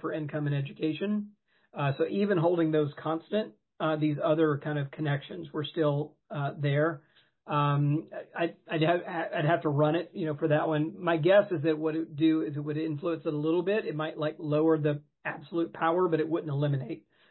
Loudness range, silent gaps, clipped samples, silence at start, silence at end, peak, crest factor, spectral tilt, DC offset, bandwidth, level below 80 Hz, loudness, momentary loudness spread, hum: 3 LU; none; under 0.1%; 0.05 s; 0.3 s; -12 dBFS; 18 dB; -11.5 dB/octave; under 0.1%; 4.3 kHz; -74 dBFS; -29 LUFS; 8 LU; none